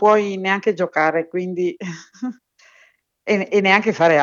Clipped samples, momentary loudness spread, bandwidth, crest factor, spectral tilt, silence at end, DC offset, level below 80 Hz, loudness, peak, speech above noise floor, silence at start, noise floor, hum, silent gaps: under 0.1%; 16 LU; 7.4 kHz; 18 dB; -5.5 dB/octave; 0 s; under 0.1%; -76 dBFS; -18 LUFS; 0 dBFS; 38 dB; 0 s; -56 dBFS; none; none